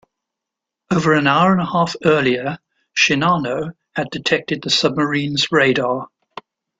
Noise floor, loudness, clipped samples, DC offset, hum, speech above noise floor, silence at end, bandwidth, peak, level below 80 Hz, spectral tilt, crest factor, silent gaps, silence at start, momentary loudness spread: -84 dBFS; -17 LUFS; under 0.1%; under 0.1%; none; 67 dB; 0.75 s; 9.2 kHz; -2 dBFS; -56 dBFS; -4.5 dB/octave; 18 dB; none; 0.9 s; 11 LU